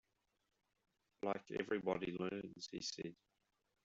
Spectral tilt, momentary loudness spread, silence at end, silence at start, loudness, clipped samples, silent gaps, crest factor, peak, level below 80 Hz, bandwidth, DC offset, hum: -4 dB/octave; 9 LU; 0.7 s; 1.25 s; -44 LUFS; under 0.1%; none; 22 dB; -26 dBFS; -78 dBFS; 8 kHz; under 0.1%; none